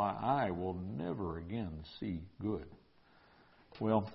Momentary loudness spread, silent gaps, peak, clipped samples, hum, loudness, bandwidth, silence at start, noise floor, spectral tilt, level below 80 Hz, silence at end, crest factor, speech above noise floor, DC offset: 10 LU; none; -18 dBFS; under 0.1%; none; -39 LUFS; 5.6 kHz; 0 s; -65 dBFS; -6.5 dB/octave; -56 dBFS; 0 s; 20 dB; 28 dB; under 0.1%